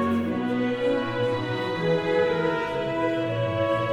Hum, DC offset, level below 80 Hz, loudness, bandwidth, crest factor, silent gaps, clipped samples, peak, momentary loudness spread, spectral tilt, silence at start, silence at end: none; under 0.1%; -56 dBFS; -25 LUFS; 11 kHz; 14 dB; none; under 0.1%; -12 dBFS; 3 LU; -7 dB/octave; 0 s; 0 s